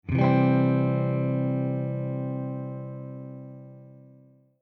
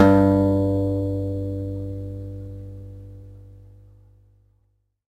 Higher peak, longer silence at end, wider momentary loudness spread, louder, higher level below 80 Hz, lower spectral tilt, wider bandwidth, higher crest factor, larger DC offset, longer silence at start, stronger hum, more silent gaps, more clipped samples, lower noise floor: second, -10 dBFS vs 0 dBFS; second, 0.65 s vs 1.55 s; second, 21 LU vs 24 LU; second, -26 LUFS vs -23 LUFS; second, -56 dBFS vs -44 dBFS; first, -11.5 dB/octave vs -9.5 dB/octave; second, 4.5 kHz vs 8.6 kHz; second, 16 dB vs 22 dB; neither; about the same, 0.05 s vs 0 s; neither; neither; neither; second, -56 dBFS vs -67 dBFS